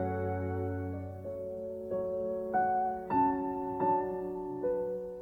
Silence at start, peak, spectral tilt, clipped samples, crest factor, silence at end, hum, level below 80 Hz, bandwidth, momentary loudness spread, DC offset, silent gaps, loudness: 0 s; -18 dBFS; -10.5 dB/octave; under 0.1%; 16 dB; 0 s; none; -62 dBFS; 16.5 kHz; 10 LU; under 0.1%; none; -34 LUFS